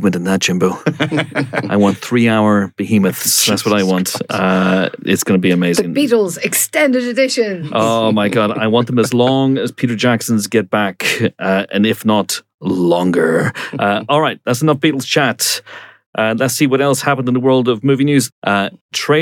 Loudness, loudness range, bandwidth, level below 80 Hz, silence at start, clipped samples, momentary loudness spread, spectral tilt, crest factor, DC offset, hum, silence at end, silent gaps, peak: -15 LUFS; 2 LU; 19.5 kHz; -64 dBFS; 0 s; under 0.1%; 5 LU; -4.5 dB/octave; 14 dB; under 0.1%; none; 0 s; 12.54-12.59 s, 16.06-16.13 s, 18.32-18.42 s, 18.81-18.89 s; -2 dBFS